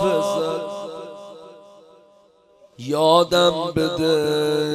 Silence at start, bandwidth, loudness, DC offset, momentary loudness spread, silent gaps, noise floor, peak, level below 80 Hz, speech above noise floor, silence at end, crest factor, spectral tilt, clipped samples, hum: 0 s; 16 kHz; -19 LUFS; under 0.1%; 20 LU; none; -55 dBFS; -4 dBFS; -56 dBFS; 36 dB; 0 s; 18 dB; -5 dB/octave; under 0.1%; none